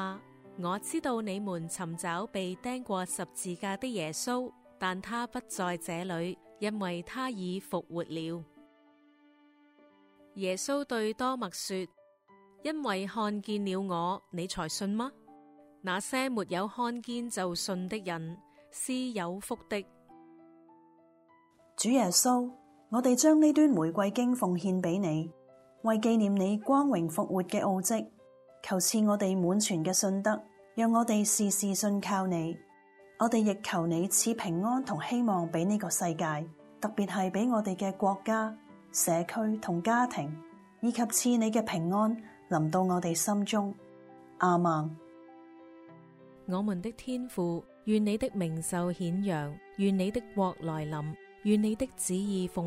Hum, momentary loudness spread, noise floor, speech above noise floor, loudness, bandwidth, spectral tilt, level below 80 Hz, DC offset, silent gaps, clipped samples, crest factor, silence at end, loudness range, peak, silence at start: none; 11 LU; -63 dBFS; 33 dB; -31 LUFS; 16 kHz; -4.5 dB/octave; -68 dBFS; under 0.1%; none; under 0.1%; 20 dB; 0 s; 8 LU; -12 dBFS; 0 s